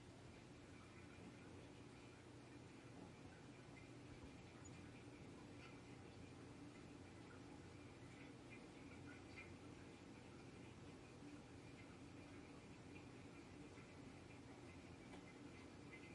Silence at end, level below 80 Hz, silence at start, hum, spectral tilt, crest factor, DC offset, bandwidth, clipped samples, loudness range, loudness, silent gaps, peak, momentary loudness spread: 0 s; -76 dBFS; 0 s; none; -5.5 dB/octave; 14 dB; under 0.1%; 11 kHz; under 0.1%; 1 LU; -60 LUFS; none; -46 dBFS; 2 LU